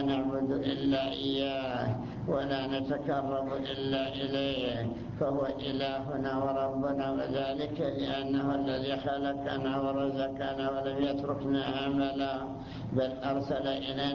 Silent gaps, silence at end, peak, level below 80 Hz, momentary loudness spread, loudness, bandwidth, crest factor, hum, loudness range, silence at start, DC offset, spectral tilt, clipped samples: none; 0 s; -18 dBFS; -56 dBFS; 3 LU; -32 LUFS; 6.8 kHz; 14 dB; none; 1 LU; 0 s; under 0.1%; -7.5 dB/octave; under 0.1%